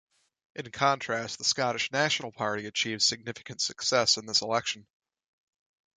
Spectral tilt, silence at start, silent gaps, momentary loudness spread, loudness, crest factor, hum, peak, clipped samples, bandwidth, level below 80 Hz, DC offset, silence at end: -2 dB/octave; 0.55 s; none; 14 LU; -27 LUFS; 20 dB; none; -10 dBFS; under 0.1%; 11 kHz; -70 dBFS; under 0.1%; 1.15 s